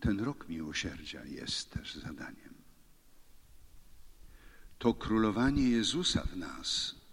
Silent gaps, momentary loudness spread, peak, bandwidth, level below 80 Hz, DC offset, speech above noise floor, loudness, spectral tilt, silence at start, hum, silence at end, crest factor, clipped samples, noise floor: none; 15 LU; -16 dBFS; 16 kHz; -48 dBFS; under 0.1%; 26 dB; -33 LUFS; -4.5 dB/octave; 0 s; none; 0 s; 20 dB; under 0.1%; -59 dBFS